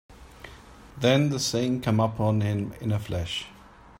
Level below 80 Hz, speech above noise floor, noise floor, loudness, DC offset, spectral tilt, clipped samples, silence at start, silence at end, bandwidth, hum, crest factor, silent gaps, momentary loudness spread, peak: -52 dBFS; 23 dB; -48 dBFS; -26 LUFS; under 0.1%; -5.5 dB/octave; under 0.1%; 0.1 s; 0.45 s; 16 kHz; none; 20 dB; none; 23 LU; -8 dBFS